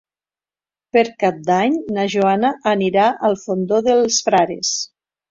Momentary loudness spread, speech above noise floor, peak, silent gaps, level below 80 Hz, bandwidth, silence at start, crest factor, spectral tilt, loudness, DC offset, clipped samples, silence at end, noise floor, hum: 5 LU; over 73 dB; -2 dBFS; none; -60 dBFS; 7.8 kHz; 0.95 s; 16 dB; -4 dB/octave; -17 LUFS; under 0.1%; under 0.1%; 0.45 s; under -90 dBFS; none